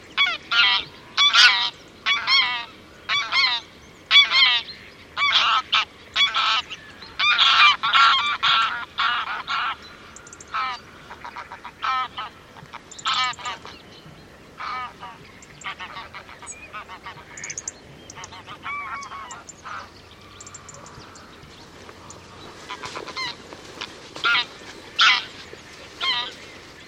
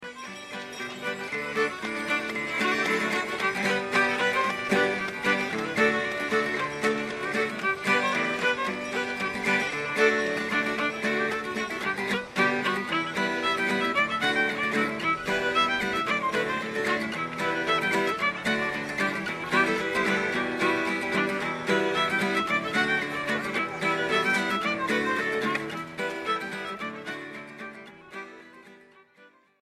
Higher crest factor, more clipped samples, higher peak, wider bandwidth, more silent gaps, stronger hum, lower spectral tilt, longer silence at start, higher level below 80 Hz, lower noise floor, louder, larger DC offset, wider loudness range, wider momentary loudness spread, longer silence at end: first, 24 dB vs 18 dB; neither; first, 0 dBFS vs -10 dBFS; about the same, 16 kHz vs 15.5 kHz; neither; neither; second, 0.5 dB/octave vs -4 dB/octave; about the same, 0 s vs 0 s; about the same, -60 dBFS vs -62 dBFS; second, -46 dBFS vs -58 dBFS; first, -19 LUFS vs -26 LUFS; neither; first, 18 LU vs 3 LU; first, 26 LU vs 9 LU; second, 0 s vs 0.35 s